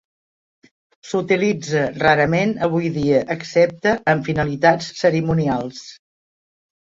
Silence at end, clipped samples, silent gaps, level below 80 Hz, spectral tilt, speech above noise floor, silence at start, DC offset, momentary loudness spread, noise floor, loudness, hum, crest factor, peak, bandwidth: 1 s; under 0.1%; none; -50 dBFS; -6 dB/octave; over 72 dB; 1.05 s; under 0.1%; 6 LU; under -90 dBFS; -19 LUFS; none; 18 dB; -2 dBFS; 7.8 kHz